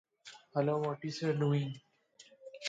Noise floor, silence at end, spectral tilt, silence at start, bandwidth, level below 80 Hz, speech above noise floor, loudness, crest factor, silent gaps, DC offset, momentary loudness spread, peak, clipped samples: -62 dBFS; 0 s; -6.5 dB/octave; 0.25 s; 7.8 kHz; -78 dBFS; 29 dB; -34 LUFS; 18 dB; none; under 0.1%; 22 LU; -18 dBFS; under 0.1%